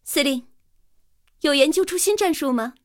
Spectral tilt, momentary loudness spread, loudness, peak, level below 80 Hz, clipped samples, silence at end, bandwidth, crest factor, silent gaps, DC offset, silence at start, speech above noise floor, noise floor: -1 dB/octave; 7 LU; -20 LUFS; -4 dBFS; -60 dBFS; under 0.1%; 0.15 s; 17 kHz; 20 dB; none; under 0.1%; 0.05 s; 42 dB; -63 dBFS